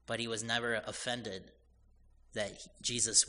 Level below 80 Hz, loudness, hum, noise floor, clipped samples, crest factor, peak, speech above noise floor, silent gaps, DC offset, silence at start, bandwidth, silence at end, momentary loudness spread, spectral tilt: -64 dBFS; -36 LUFS; none; -64 dBFS; under 0.1%; 24 dB; -14 dBFS; 29 dB; none; under 0.1%; 0.1 s; 10.5 kHz; 0 s; 12 LU; -1.5 dB/octave